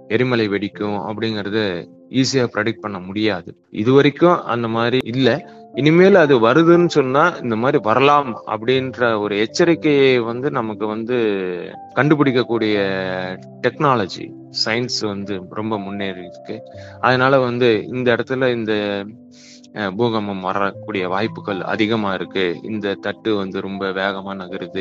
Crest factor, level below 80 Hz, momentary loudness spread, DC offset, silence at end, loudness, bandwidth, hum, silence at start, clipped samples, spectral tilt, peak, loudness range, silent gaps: 18 dB; -62 dBFS; 13 LU; under 0.1%; 0 s; -18 LUFS; 8 kHz; none; 0.1 s; under 0.1%; -6 dB/octave; 0 dBFS; 7 LU; none